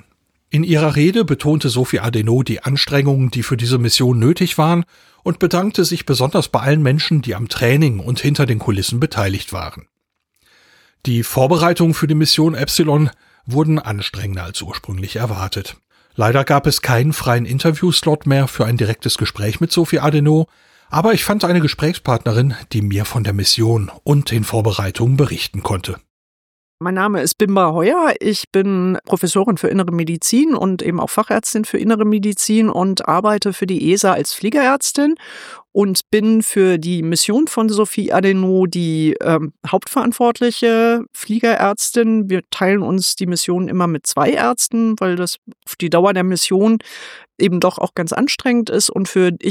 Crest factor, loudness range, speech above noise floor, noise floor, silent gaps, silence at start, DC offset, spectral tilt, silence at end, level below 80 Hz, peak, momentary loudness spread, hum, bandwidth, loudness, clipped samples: 16 dB; 3 LU; 55 dB; -71 dBFS; 26.10-26.78 s, 28.47-28.51 s, 45.38-45.42 s; 0.55 s; under 0.1%; -5 dB/octave; 0 s; -46 dBFS; 0 dBFS; 8 LU; none; 18.5 kHz; -16 LUFS; under 0.1%